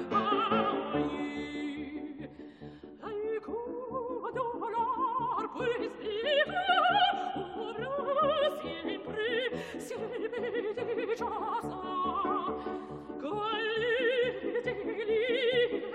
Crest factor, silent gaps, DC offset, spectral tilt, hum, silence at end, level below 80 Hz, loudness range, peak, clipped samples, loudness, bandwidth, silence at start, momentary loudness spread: 18 dB; none; under 0.1%; -5 dB/octave; none; 0 s; -64 dBFS; 7 LU; -14 dBFS; under 0.1%; -32 LUFS; 12 kHz; 0 s; 12 LU